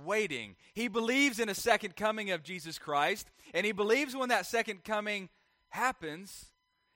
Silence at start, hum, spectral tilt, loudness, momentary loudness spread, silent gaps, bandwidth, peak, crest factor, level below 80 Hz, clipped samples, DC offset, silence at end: 0 s; none; -3 dB/octave; -32 LUFS; 13 LU; none; 16.5 kHz; -12 dBFS; 22 dB; -68 dBFS; under 0.1%; under 0.1%; 0.5 s